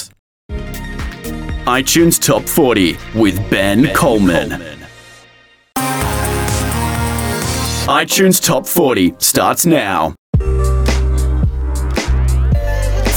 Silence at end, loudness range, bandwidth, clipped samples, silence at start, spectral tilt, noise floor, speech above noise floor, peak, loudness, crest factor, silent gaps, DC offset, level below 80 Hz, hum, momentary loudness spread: 0 s; 4 LU; 19.5 kHz; under 0.1%; 0 s; -4.5 dB/octave; -47 dBFS; 35 dB; 0 dBFS; -14 LUFS; 14 dB; 0.19-0.49 s, 10.18-10.33 s; under 0.1%; -20 dBFS; none; 14 LU